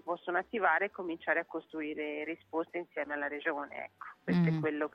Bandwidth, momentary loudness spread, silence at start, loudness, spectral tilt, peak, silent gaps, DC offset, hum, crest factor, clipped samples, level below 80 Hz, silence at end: 5.8 kHz; 11 LU; 0.05 s; -34 LUFS; -9 dB/octave; -14 dBFS; none; under 0.1%; none; 20 dB; under 0.1%; -74 dBFS; 0.05 s